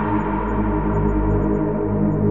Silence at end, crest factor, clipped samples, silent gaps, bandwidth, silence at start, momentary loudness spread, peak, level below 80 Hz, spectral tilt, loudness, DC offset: 0 s; 12 dB; under 0.1%; none; 3.6 kHz; 0 s; 2 LU; -8 dBFS; -26 dBFS; -11.5 dB/octave; -21 LUFS; 1%